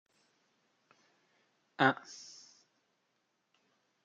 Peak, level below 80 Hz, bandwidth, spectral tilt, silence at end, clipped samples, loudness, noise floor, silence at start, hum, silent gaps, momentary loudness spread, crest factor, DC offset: -12 dBFS; -90 dBFS; 7.8 kHz; -4.5 dB/octave; 1.9 s; under 0.1%; -32 LUFS; -80 dBFS; 1.8 s; none; none; 25 LU; 28 dB; under 0.1%